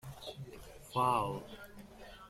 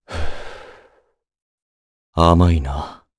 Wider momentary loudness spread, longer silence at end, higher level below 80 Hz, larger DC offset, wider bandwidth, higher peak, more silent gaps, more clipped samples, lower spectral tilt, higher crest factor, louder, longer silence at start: about the same, 21 LU vs 23 LU; second, 0 s vs 0.25 s; second, -60 dBFS vs -30 dBFS; neither; first, 16.5 kHz vs 11 kHz; second, -18 dBFS vs 0 dBFS; second, none vs 1.42-2.13 s; neither; second, -5.5 dB/octave vs -7.5 dB/octave; about the same, 20 dB vs 20 dB; second, -36 LUFS vs -18 LUFS; about the same, 0.05 s vs 0.1 s